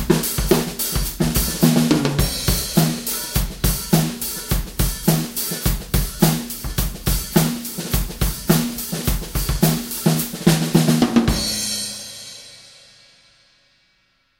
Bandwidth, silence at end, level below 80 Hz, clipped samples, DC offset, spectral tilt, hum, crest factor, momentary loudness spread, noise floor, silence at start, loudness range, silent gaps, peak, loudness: 17 kHz; 1.7 s; -28 dBFS; under 0.1%; under 0.1%; -4.5 dB/octave; none; 20 dB; 8 LU; -63 dBFS; 0 s; 3 LU; none; 0 dBFS; -20 LUFS